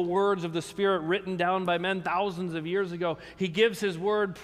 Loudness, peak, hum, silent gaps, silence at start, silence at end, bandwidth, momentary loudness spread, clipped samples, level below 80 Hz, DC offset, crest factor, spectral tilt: -28 LUFS; -10 dBFS; none; none; 0 s; 0 s; 15 kHz; 7 LU; under 0.1%; -64 dBFS; under 0.1%; 18 dB; -5.5 dB/octave